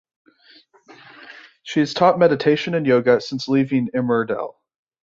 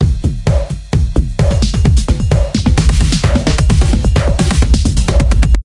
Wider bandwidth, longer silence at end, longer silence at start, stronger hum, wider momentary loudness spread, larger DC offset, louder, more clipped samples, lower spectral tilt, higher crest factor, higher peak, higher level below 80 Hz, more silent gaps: second, 7.6 kHz vs 11.5 kHz; first, 0.55 s vs 0 s; first, 1.2 s vs 0 s; neither; first, 16 LU vs 4 LU; neither; second, -19 LUFS vs -13 LUFS; neither; about the same, -6.5 dB/octave vs -6 dB/octave; first, 18 dB vs 10 dB; about the same, -2 dBFS vs 0 dBFS; second, -62 dBFS vs -14 dBFS; neither